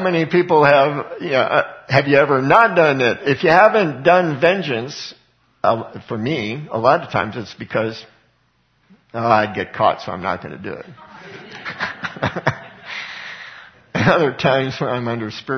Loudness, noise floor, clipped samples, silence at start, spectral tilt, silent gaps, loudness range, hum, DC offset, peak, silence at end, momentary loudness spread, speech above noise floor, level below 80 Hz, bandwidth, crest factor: -17 LUFS; -62 dBFS; under 0.1%; 0 s; -6.5 dB/octave; none; 10 LU; none; under 0.1%; 0 dBFS; 0 s; 18 LU; 45 dB; -56 dBFS; 6.6 kHz; 18 dB